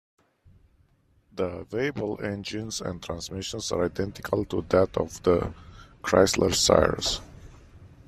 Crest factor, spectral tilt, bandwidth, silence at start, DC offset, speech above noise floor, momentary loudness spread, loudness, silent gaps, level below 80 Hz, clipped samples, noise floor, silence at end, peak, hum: 24 dB; -4 dB/octave; 14.5 kHz; 1.35 s; under 0.1%; 38 dB; 13 LU; -26 LUFS; none; -48 dBFS; under 0.1%; -64 dBFS; 0.2 s; -4 dBFS; none